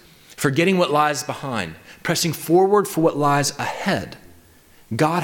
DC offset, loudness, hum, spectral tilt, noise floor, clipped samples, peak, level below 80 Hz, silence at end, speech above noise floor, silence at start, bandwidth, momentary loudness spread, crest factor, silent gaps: under 0.1%; -20 LUFS; none; -4.5 dB/octave; -51 dBFS; under 0.1%; -6 dBFS; -56 dBFS; 0 s; 31 dB; 0.3 s; 19 kHz; 10 LU; 14 dB; none